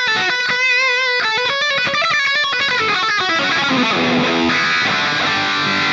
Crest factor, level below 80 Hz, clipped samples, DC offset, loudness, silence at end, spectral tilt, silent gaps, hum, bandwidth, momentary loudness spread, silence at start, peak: 10 dB; -56 dBFS; under 0.1%; under 0.1%; -15 LUFS; 0 s; -2.5 dB/octave; none; none; 8 kHz; 2 LU; 0 s; -6 dBFS